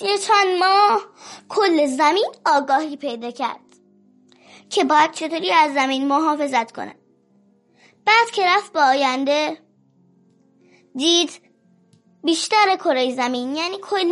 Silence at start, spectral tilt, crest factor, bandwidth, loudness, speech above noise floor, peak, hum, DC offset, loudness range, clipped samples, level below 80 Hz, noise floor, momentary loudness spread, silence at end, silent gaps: 0 s; -1.5 dB/octave; 16 dB; 11.5 kHz; -18 LUFS; 40 dB; -4 dBFS; none; under 0.1%; 3 LU; under 0.1%; -82 dBFS; -58 dBFS; 12 LU; 0 s; none